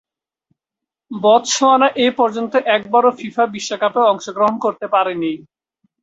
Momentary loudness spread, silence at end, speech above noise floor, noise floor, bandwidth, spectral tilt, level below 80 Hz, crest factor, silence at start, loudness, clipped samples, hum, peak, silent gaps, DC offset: 8 LU; 0.6 s; 69 dB; -85 dBFS; 8 kHz; -3 dB/octave; -64 dBFS; 16 dB; 1.1 s; -16 LUFS; under 0.1%; none; -2 dBFS; none; under 0.1%